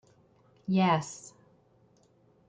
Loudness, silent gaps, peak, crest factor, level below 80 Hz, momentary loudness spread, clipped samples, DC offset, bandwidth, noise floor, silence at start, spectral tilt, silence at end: -28 LUFS; none; -14 dBFS; 18 dB; -72 dBFS; 22 LU; under 0.1%; under 0.1%; 9.2 kHz; -65 dBFS; 0.7 s; -6 dB/octave; 1.2 s